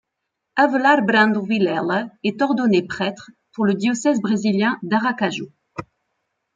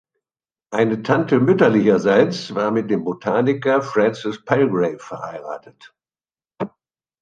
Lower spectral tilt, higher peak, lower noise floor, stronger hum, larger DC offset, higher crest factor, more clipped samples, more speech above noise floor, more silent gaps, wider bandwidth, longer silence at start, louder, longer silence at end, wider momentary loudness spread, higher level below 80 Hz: second, -5.5 dB/octave vs -7 dB/octave; about the same, -2 dBFS vs 0 dBFS; second, -79 dBFS vs under -90 dBFS; neither; neither; about the same, 18 dB vs 18 dB; neither; second, 60 dB vs over 72 dB; neither; second, 7.8 kHz vs 9 kHz; second, 0.55 s vs 0.7 s; about the same, -19 LUFS vs -18 LUFS; first, 0.75 s vs 0.55 s; about the same, 17 LU vs 16 LU; about the same, -64 dBFS vs -62 dBFS